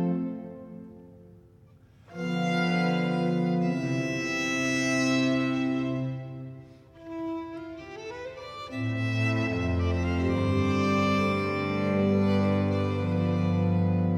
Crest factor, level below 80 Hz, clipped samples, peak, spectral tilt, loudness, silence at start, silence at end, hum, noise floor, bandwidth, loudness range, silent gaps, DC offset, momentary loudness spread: 14 dB; -50 dBFS; under 0.1%; -14 dBFS; -6.5 dB/octave; -27 LUFS; 0 s; 0 s; none; -55 dBFS; 10 kHz; 7 LU; none; under 0.1%; 16 LU